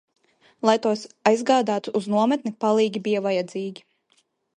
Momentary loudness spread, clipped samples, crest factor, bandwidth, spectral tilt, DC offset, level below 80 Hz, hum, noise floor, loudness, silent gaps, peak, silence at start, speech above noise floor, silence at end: 6 LU; under 0.1%; 20 dB; 10.5 kHz; -5 dB/octave; under 0.1%; -74 dBFS; none; -67 dBFS; -23 LUFS; none; -4 dBFS; 0.65 s; 45 dB; 0.85 s